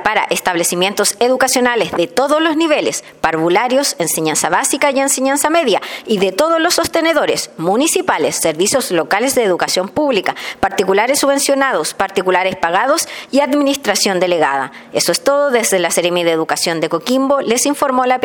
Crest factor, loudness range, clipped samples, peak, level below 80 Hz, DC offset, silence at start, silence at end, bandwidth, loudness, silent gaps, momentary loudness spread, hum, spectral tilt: 14 dB; 1 LU; under 0.1%; 0 dBFS; -52 dBFS; under 0.1%; 0 s; 0 s; 17.5 kHz; -14 LUFS; none; 4 LU; none; -2.5 dB/octave